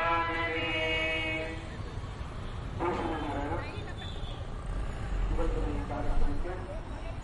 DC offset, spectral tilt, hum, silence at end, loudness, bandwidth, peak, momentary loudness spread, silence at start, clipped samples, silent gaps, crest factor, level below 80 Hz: under 0.1%; -6 dB/octave; none; 0 s; -34 LUFS; 11 kHz; -16 dBFS; 12 LU; 0 s; under 0.1%; none; 16 dB; -36 dBFS